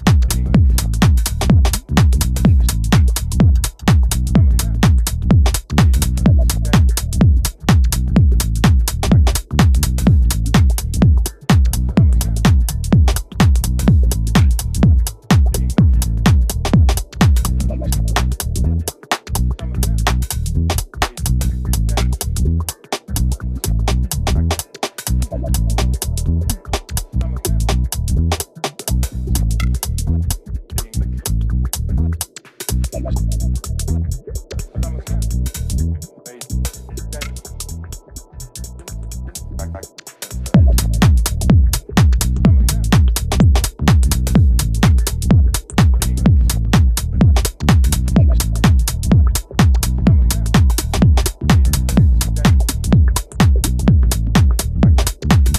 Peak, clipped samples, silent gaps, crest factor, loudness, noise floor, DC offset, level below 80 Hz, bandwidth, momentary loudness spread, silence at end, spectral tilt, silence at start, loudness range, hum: 0 dBFS; under 0.1%; none; 14 dB; -16 LUFS; -34 dBFS; under 0.1%; -18 dBFS; 15.5 kHz; 10 LU; 0 s; -5.5 dB/octave; 0 s; 8 LU; none